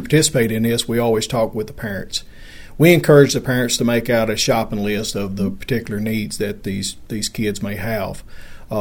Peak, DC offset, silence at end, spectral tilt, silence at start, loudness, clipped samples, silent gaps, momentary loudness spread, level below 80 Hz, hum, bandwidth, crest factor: 0 dBFS; under 0.1%; 0 s; -4.5 dB/octave; 0 s; -18 LUFS; under 0.1%; none; 13 LU; -40 dBFS; none; 19 kHz; 18 dB